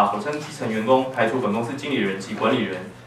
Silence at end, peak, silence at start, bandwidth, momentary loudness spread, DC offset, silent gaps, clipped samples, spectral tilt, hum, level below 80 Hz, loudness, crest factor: 0 s; -4 dBFS; 0 s; 13.5 kHz; 8 LU; under 0.1%; none; under 0.1%; -5.5 dB/octave; none; -62 dBFS; -23 LUFS; 18 dB